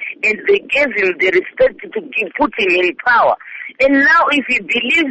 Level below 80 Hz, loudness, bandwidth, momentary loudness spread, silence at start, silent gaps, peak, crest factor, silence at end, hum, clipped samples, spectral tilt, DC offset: -50 dBFS; -14 LUFS; 8.6 kHz; 9 LU; 0 s; none; -4 dBFS; 12 dB; 0 s; none; under 0.1%; -4 dB/octave; under 0.1%